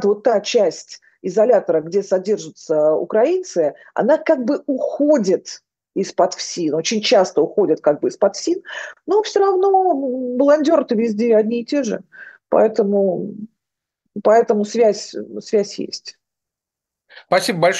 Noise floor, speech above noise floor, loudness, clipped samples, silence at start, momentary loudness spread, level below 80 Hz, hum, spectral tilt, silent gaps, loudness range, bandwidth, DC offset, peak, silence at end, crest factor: -85 dBFS; 68 dB; -18 LUFS; under 0.1%; 0 s; 14 LU; -74 dBFS; none; -4.5 dB/octave; none; 3 LU; 12.5 kHz; under 0.1%; -2 dBFS; 0 s; 16 dB